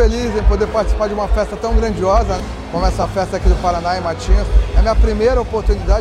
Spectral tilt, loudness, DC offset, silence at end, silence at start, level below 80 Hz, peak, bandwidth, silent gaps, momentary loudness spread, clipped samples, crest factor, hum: -6.5 dB/octave; -17 LUFS; under 0.1%; 0 s; 0 s; -16 dBFS; 0 dBFS; 9.6 kHz; none; 4 LU; under 0.1%; 14 dB; none